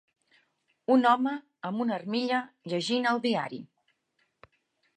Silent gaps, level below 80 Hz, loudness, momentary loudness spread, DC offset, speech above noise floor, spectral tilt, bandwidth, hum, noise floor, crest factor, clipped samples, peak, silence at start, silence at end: none; -82 dBFS; -28 LUFS; 14 LU; under 0.1%; 48 dB; -5 dB/octave; 9.8 kHz; none; -75 dBFS; 20 dB; under 0.1%; -10 dBFS; 0.9 s; 1.3 s